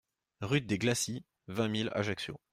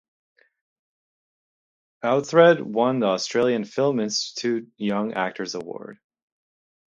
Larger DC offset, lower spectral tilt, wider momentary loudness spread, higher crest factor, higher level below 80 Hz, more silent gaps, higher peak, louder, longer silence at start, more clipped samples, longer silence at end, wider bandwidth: neither; about the same, -4.5 dB/octave vs -4.5 dB/octave; second, 11 LU vs 15 LU; about the same, 18 dB vs 22 dB; about the same, -66 dBFS vs -70 dBFS; neither; second, -16 dBFS vs -2 dBFS; second, -33 LUFS vs -22 LUFS; second, 0.4 s vs 2.05 s; neither; second, 0.15 s vs 0.95 s; first, 15.5 kHz vs 7.6 kHz